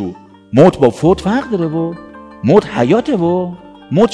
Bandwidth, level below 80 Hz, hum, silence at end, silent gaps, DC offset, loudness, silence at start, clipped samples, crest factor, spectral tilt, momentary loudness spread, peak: 11 kHz; -42 dBFS; none; 0 s; none; under 0.1%; -13 LUFS; 0 s; 0.7%; 14 dB; -7.5 dB/octave; 14 LU; 0 dBFS